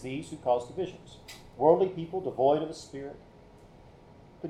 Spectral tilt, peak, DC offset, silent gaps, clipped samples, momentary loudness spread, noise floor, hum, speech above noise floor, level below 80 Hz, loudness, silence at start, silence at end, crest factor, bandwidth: -6.5 dB/octave; -8 dBFS; under 0.1%; none; under 0.1%; 23 LU; -54 dBFS; none; 24 dB; -60 dBFS; -29 LUFS; 0 s; 0 s; 22 dB; 13 kHz